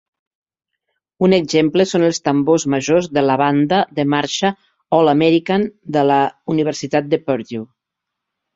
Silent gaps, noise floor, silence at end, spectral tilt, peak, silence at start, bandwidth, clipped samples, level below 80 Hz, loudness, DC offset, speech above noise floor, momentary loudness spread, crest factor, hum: none; -81 dBFS; 0.9 s; -5.5 dB/octave; -2 dBFS; 1.2 s; 7.8 kHz; under 0.1%; -58 dBFS; -16 LUFS; under 0.1%; 65 dB; 6 LU; 16 dB; none